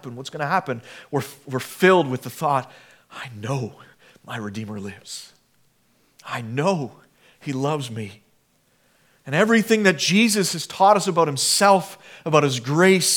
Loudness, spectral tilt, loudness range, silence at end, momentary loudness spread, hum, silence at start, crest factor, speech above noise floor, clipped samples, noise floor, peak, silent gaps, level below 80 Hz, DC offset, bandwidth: -20 LUFS; -4 dB/octave; 15 LU; 0 s; 18 LU; none; 0.05 s; 20 dB; 42 dB; under 0.1%; -63 dBFS; -2 dBFS; none; -74 dBFS; under 0.1%; 19 kHz